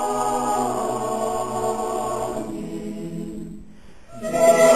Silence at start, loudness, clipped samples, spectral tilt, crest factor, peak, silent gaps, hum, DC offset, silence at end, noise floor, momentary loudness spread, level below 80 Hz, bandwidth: 0 s; -24 LUFS; under 0.1%; -4 dB/octave; 18 dB; -4 dBFS; none; none; 0.7%; 0 s; -46 dBFS; 15 LU; -50 dBFS; 16 kHz